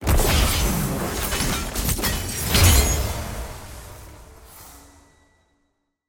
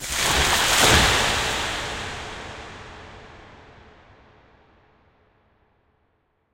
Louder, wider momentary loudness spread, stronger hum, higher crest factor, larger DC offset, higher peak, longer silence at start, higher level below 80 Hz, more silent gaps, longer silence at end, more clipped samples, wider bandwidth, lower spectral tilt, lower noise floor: about the same, -21 LUFS vs -19 LUFS; about the same, 25 LU vs 25 LU; neither; about the same, 20 dB vs 24 dB; neither; about the same, -4 dBFS vs -2 dBFS; about the same, 0 s vs 0 s; first, -26 dBFS vs -38 dBFS; neither; second, 1.3 s vs 3 s; neither; about the same, 17 kHz vs 16 kHz; first, -3.5 dB/octave vs -2 dB/octave; about the same, -71 dBFS vs -68 dBFS